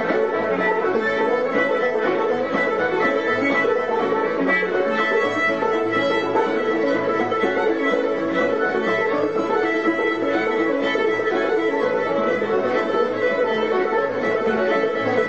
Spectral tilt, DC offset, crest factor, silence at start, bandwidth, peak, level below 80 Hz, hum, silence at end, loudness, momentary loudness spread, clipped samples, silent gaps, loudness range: -5.5 dB/octave; 0.3%; 14 dB; 0 s; 8 kHz; -6 dBFS; -60 dBFS; none; 0 s; -20 LUFS; 2 LU; under 0.1%; none; 1 LU